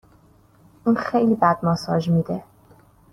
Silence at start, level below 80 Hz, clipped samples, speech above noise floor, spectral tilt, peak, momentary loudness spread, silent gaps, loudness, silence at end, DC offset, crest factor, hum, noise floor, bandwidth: 0.85 s; -56 dBFS; under 0.1%; 34 dB; -8 dB/octave; -4 dBFS; 9 LU; none; -21 LUFS; 0.7 s; under 0.1%; 18 dB; none; -54 dBFS; 12 kHz